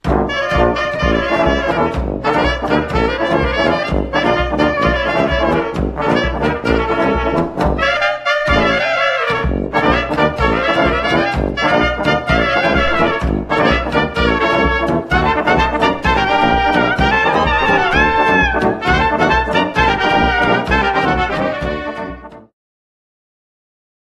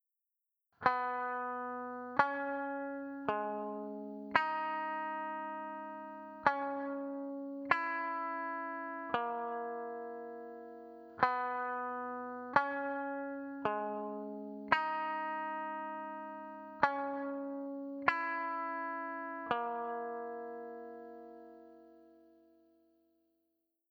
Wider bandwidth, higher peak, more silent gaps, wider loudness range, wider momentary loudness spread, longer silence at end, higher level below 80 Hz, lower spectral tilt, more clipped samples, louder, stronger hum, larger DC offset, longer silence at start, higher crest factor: first, 11.5 kHz vs 7.6 kHz; first, 0 dBFS vs -10 dBFS; neither; about the same, 3 LU vs 5 LU; second, 4 LU vs 14 LU; about the same, 1.7 s vs 1.7 s; first, -26 dBFS vs -78 dBFS; about the same, -6 dB/octave vs -6 dB/octave; neither; first, -15 LUFS vs -38 LUFS; neither; neither; second, 0.05 s vs 0.8 s; second, 14 dB vs 28 dB